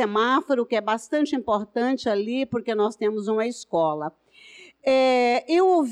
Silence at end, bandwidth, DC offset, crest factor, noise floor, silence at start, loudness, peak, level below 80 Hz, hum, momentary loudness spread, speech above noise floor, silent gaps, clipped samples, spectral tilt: 0 s; 11.5 kHz; under 0.1%; 10 dB; -49 dBFS; 0 s; -23 LUFS; -12 dBFS; -66 dBFS; none; 7 LU; 26 dB; none; under 0.1%; -5 dB/octave